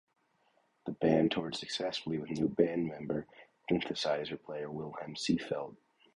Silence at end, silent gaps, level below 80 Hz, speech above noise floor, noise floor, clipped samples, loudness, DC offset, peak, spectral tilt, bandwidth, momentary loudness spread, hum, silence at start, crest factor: 0.4 s; none; -66 dBFS; 39 dB; -73 dBFS; under 0.1%; -34 LUFS; under 0.1%; -12 dBFS; -5.5 dB/octave; 11 kHz; 12 LU; none; 0.85 s; 22 dB